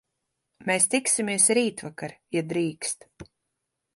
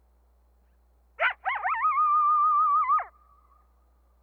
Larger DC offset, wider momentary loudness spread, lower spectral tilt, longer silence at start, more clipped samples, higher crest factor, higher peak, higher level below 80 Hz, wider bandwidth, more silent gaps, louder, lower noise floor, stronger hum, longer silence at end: neither; first, 16 LU vs 7 LU; about the same, -2.5 dB/octave vs -3 dB/octave; second, 0.6 s vs 1.2 s; neither; first, 22 dB vs 14 dB; first, -6 dBFS vs -14 dBFS; second, -68 dBFS vs -62 dBFS; first, 12 kHz vs 3.9 kHz; neither; about the same, -24 LUFS vs -24 LUFS; first, -82 dBFS vs -62 dBFS; second, none vs 60 Hz at -65 dBFS; second, 0.7 s vs 1.15 s